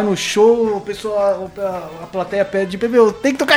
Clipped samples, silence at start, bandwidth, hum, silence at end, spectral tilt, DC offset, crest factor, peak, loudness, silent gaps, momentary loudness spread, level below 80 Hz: under 0.1%; 0 s; 16 kHz; none; 0 s; -4 dB/octave; under 0.1%; 16 dB; 0 dBFS; -17 LUFS; none; 11 LU; -52 dBFS